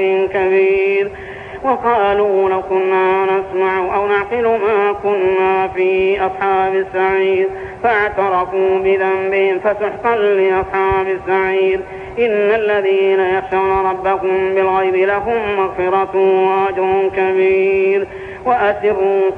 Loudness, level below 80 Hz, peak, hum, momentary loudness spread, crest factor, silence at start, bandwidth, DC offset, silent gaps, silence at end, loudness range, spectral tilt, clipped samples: -15 LUFS; -44 dBFS; -2 dBFS; none; 4 LU; 12 dB; 0 s; 4.3 kHz; under 0.1%; none; 0 s; 1 LU; -7 dB/octave; under 0.1%